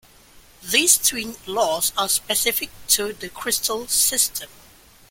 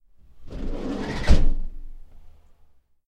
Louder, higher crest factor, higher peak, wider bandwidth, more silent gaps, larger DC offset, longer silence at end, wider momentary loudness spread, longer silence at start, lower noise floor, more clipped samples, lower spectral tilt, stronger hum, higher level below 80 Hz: first, -19 LUFS vs -27 LUFS; about the same, 22 dB vs 20 dB; about the same, 0 dBFS vs -2 dBFS; first, 17 kHz vs 8.2 kHz; neither; neither; second, 0.65 s vs 0.8 s; second, 14 LU vs 21 LU; about the same, 0.35 s vs 0.35 s; second, -50 dBFS vs -54 dBFS; neither; second, 0 dB/octave vs -6.5 dB/octave; neither; second, -52 dBFS vs -24 dBFS